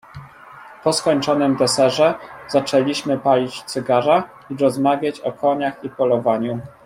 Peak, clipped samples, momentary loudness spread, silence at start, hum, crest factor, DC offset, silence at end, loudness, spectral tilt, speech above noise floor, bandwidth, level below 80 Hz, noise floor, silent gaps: -2 dBFS; under 0.1%; 8 LU; 0.15 s; none; 16 dB; under 0.1%; 0.15 s; -19 LUFS; -4.5 dB/octave; 23 dB; 16 kHz; -60 dBFS; -41 dBFS; none